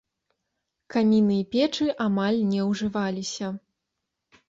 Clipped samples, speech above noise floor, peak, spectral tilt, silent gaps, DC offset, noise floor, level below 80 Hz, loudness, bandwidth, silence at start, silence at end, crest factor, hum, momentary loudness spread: under 0.1%; 59 dB; -10 dBFS; -6 dB/octave; none; under 0.1%; -82 dBFS; -64 dBFS; -25 LUFS; 7.8 kHz; 0.9 s; 0.9 s; 16 dB; none; 10 LU